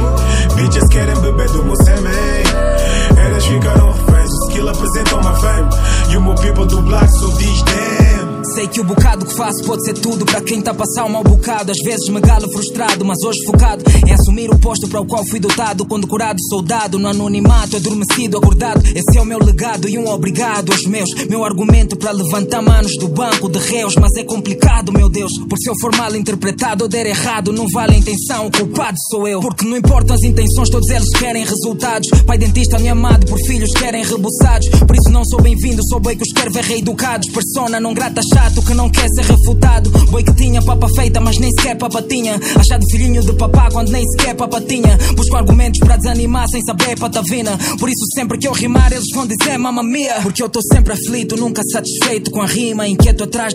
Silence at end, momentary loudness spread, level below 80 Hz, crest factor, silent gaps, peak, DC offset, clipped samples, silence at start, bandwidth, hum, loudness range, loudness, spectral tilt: 0 s; 6 LU; -14 dBFS; 12 dB; none; 0 dBFS; under 0.1%; 0.2%; 0 s; 16 kHz; none; 3 LU; -13 LUFS; -5 dB/octave